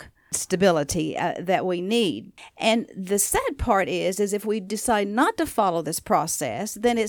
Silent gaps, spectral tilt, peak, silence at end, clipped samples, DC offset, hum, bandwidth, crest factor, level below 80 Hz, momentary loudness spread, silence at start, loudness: none; -3.5 dB/octave; -6 dBFS; 0 s; under 0.1%; under 0.1%; none; 19.5 kHz; 18 dB; -46 dBFS; 6 LU; 0 s; -24 LUFS